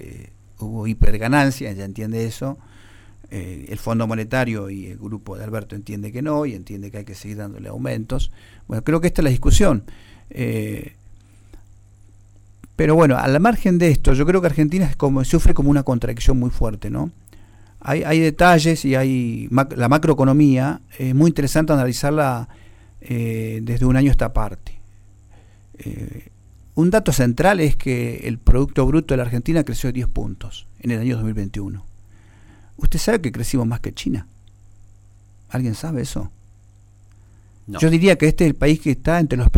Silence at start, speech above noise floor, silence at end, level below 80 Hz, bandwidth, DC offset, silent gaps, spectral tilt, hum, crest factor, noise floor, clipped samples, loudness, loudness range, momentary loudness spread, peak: 0 s; 31 dB; 0 s; -26 dBFS; 16.5 kHz; under 0.1%; none; -6.5 dB/octave; 50 Hz at -50 dBFS; 16 dB; -48 dBFS; under 0.1%; -19 LUFS; 9 LU; 17 LU; -4 dBFS